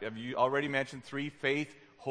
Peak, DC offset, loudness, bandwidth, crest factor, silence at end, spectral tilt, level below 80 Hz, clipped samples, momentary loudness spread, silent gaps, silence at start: -14 dBFS; under 0.1%; -34 LUFS; 10.5 kHz; 20 dB; 0 s; -5.5 dB/octave; -76 dBFS; under 0.1%; 10 LU; none; 0 s